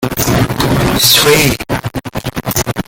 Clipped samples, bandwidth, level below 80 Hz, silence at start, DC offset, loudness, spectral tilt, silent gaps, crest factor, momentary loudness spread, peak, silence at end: under 0.1%; over 20 kHz; -30 dBFS; 0 s; under 0.1%; -11 LUFS; -3.5 dB/octave; none; 12 dB; 14 LU; 0 dBFS; 0.05 s